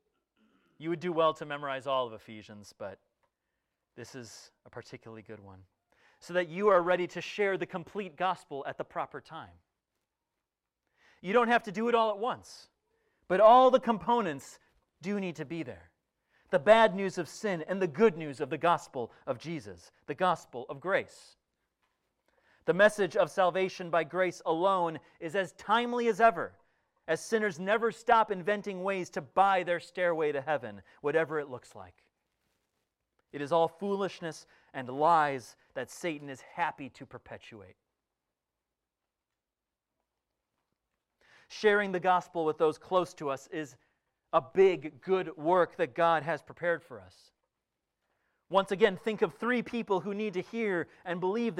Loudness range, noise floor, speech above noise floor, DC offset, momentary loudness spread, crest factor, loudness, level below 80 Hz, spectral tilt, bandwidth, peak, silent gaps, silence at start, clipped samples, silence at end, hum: 11 LU; under -90 dBFS; over 60 dB; under 0.1%; 20 LU; 22 dB; -30 LUFS; -72 dBFS; -5.5 dB/octave; 14 kHz; -8 dBFS; none; 0.8 s; under 0.1%; 0 s; none